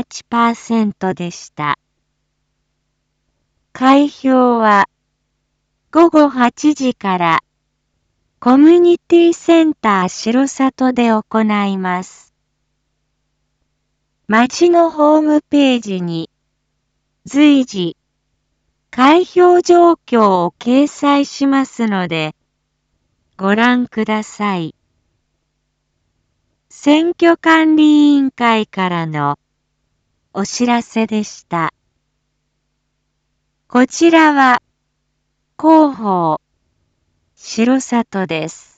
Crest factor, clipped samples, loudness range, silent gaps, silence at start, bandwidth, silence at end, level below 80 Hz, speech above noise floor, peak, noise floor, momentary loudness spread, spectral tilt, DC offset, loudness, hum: 14 dB; under 0.1%; 8 LU; none; 0 s; 8 kHz; 0.25 s; -60 dBFS; 56 dB; 0 dBFS; -69 dBFS; 12 LU; -5 dB/octave; under 0.1%; -13 LUFS; none